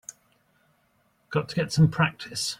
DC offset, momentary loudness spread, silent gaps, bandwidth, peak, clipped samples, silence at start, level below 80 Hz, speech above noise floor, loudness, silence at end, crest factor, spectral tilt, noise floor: under 0.1%; 9 LU; none; 14.5 kHz; -10 dBFS; under 0.1%; 0.1 s; -56 dBFS; 43 dB; -25 LUFS; 0.05 s; 18 dB; -5 dB/octave; -67 dBFS